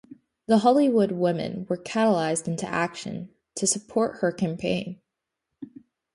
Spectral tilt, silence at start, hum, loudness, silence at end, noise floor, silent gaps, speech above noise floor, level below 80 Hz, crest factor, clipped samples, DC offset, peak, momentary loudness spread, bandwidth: -5 dB/octave; 0.1 s; none; -25 LUFS; 0.5 s; -83 dBFS; none; 59 dB; -64 dBFS; 20 dB; under 0.1%; under 0.1%; -6 dBFS; 22 LU; 11.5 kHz